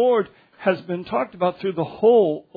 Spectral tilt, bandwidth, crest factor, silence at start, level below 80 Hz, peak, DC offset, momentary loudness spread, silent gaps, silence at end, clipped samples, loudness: -9.5 dB/octave; 4.9 kHz; 16 dB; 0 s; -64 dBFS; -6 dBFS; under 0.1%; 10 LU; none; 0.15 s; under 0.1%; -21 LUFS